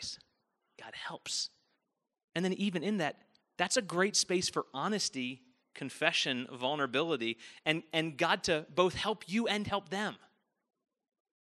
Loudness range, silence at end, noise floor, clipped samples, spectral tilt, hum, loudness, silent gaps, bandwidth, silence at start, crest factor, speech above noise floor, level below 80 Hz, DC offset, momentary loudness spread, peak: 4 LU; 1.3 s; -84 dBFS; under 0.1%; -3 dB/octave; none; -33 LUFS; 2.24-2.28 s; 13 kHz; 0 s; 24 dB; 51 dB; -70 dBFS; under 0.1%; 13 LU; -10 dBFS